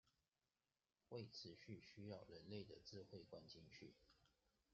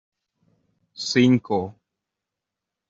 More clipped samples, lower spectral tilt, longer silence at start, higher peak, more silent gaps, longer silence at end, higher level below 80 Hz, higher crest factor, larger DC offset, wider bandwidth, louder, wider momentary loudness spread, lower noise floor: neither; about the same, -5 dB/octave vs -5.5 dB/octave; second, 0.05 s vs 1 s; second, -40 dBFS vs -6 dBFS; neither; second, 0.4 s vs 1.2 s; second, -86 dBFS vs -66 dBFS; about the same, 20 dB vs 20 dB; neither; about the same, 7.4 kHz vs 7.8 kHz; second, -59 LUFS vs -21 LUFS; second, 6 LU vs 14 LU; first, under -90 dBFS vs -85 dBFS